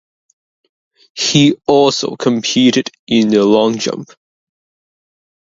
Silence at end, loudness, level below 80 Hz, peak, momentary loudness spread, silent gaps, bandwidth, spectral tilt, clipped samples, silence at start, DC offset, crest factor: 1.4 s; -13 LUFS; -56 dBFS; 0 dBFS; 9 LU; 2.99-3.07 s; 7.8 kHz; -4.5 dB/octave; under 0.1%; 1.15 s; under 0.1%; 16 dB